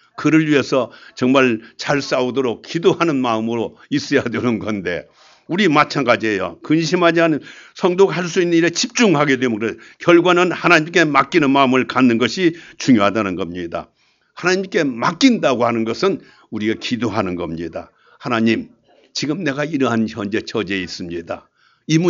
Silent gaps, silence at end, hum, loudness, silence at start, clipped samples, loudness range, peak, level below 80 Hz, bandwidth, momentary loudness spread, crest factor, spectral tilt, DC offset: none; 0 s; none; -17 LUFS; 0.2 s; under 0.1%; 7 LU; 0 dBFS; -58 dBFS; 7.6 kHz; 11 LU; 18 dB; -5 dB/octave; under 0.1%